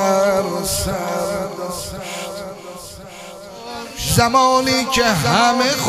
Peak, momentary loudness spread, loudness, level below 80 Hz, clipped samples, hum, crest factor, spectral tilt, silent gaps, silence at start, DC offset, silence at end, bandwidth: 0 dBFS; 20 LU; -17 LUFS; -40 dBFS; under 0.1%; none; 18 dB; -3.5 dB/octave; none; 0 s; under 0.1%; 0 s; 15.5 kHz